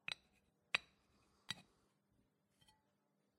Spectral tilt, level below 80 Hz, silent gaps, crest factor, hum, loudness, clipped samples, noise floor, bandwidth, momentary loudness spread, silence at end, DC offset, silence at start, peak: -1 dB/octave; -86 dBFS; none; 36 dB; none; -46 LUFS; under 0.1%; -83 dBFS; 13.5 kHz; 9 LU; 1.75 s; under 0.1%; 0.1 s; -18 dBFS